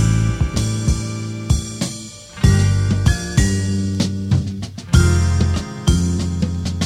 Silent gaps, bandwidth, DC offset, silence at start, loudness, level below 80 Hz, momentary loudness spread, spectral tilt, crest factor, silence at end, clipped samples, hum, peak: none; 14 kHz; under 0.1%; 0 s; -19 LUFS; -24 dBFS; 10 LU; -5.5 dB/octave; 16 dB; 0 s; under 0.1%; none; 0 dBFS